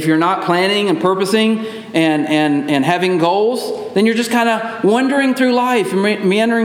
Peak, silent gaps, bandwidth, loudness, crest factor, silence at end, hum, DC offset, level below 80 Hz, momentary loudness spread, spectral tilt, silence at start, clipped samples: -2 dBFS; none; 16.5 kHz; -15 LUFS; 14 dB; 0 s; none; under 0.1%; -68 dBFS; 3 LU; -5 dB/octave; 0 s; under 0.1%